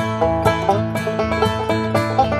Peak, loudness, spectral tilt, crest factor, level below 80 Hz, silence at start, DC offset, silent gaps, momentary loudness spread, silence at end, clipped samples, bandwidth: -2 dBFS; -19 LUFS; -6.5 dB/octave; 16 dB; -36 dBFS; 0 s; under 0.1%; none; 3 LU; 0 s; under 0.1%; 14 kHz